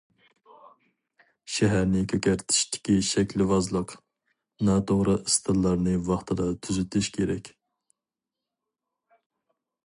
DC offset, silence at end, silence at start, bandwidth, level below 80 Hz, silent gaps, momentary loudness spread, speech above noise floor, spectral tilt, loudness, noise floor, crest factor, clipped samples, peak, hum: under 0.1%; 2.35 s; 1.5 s; 11.5 kHz; -48 dBFS; none; 7 LU; 64 dB; -5 dB/octave; -25 LUFS; -88 dBFS; 18 dB; under 0.1%; -10 dBFS; none